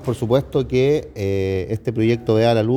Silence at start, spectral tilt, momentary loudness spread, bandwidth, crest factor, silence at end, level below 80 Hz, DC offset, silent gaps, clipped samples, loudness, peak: 0 s; -7.5 dB/octave; 6 LU; 15.5 kHz; 14 dB; 0 s; -44 dBFS; under 0.1%; none; under 0.1%; -19 LUFS; -4 dBFS